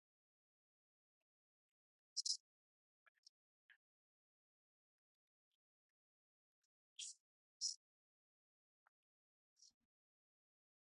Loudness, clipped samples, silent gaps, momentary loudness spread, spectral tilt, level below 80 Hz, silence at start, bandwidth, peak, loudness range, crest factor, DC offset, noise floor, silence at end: -47 LUFS; under 0.1%; 2.40-3.23 s, 3.29-3.69 s, 3.76-6.96 s, 7.20-7.60 s, 7.76-9.56 s; 17 LU; 7 dB/octave; under -90 dBFS; 2.15 s; 10 kHz; -28 dBFS; 10 LU; 30 dB; under 0.1%; under -90 dBFS; 1.25 s